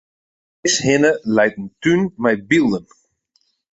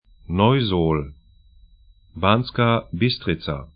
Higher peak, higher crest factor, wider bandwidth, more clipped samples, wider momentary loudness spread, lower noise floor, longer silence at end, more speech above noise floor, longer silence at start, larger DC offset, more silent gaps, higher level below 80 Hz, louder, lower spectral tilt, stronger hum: about the same, -2 dBFS vs 0 dBFS; about the same, 18 dB vs 22 dB; first, 8.4 kHz vs 5.2 kHz; neither; about the same, 6 LU vs 8 LU; first, -65 dBFS vs -52 dBFS; first, 0.95 s vs 0.1 s; first, 48 dB vs 32 dB; first, 0.65 s vs 0.3 s; neither; neither; second, -54 dBFS vs -42 dBFS; first, -17 LUFS vs -21 LUFS; second, -4 dB/octave vs -11.5 dB/octave; neither